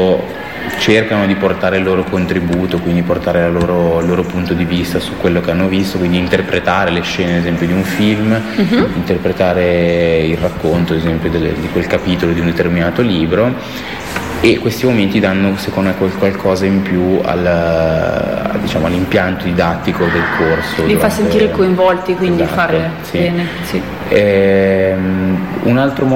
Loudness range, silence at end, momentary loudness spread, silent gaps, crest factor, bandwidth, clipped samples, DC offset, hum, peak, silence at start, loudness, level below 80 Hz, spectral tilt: 1 LU; 0 s; 4 LU; none; 14 dB; 16.5 kHz; under 0.1%; 0.5%; none; 0 dBFS; 0 s; -14 LUFS; -34 dBFS; -6.5 dB/octave